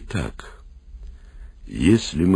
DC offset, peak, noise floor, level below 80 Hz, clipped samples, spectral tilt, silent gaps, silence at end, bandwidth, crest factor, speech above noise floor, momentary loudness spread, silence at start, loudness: under 0.1%; -4 dBFS; -41 dBFS; -36 dBFS; under 0.1%; -6 dB/octave; none; 0 s; 11 kHz; 18 dB; 21 dB; 26 LU; 0 s; -21 LUFS